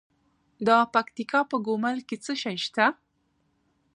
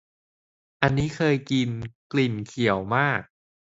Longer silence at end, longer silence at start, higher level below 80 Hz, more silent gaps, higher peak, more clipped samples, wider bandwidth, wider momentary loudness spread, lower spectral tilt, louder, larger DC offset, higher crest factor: first, 1 s vs 0.55 s; second, 0.6 s vs 0.8 s; second, -76 dBFS vs -52 dBFS; second, none vs 1.95-2.10 s; second, -6 dBFS vs 0 dBFS; neither; first, 10.5 kHz vs 8 kHz; first, 9 LU vs 6 LU; second, -4 dB/octave vs -6.5 dB/octave; about the same, -26 LUFS vs -25 LUFS; neither; about the same, 22 dB vs 26 dB